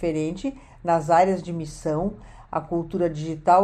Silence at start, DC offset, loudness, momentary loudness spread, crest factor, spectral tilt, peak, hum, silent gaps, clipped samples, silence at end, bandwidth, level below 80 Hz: 0 s; under 0.1%; -25 LUFS; 13 LU; 18 dB; -7 dB/octave; -6 dBFS; none; none; under 0.1%; 0 s; 10.5 kHz; -48 dBFS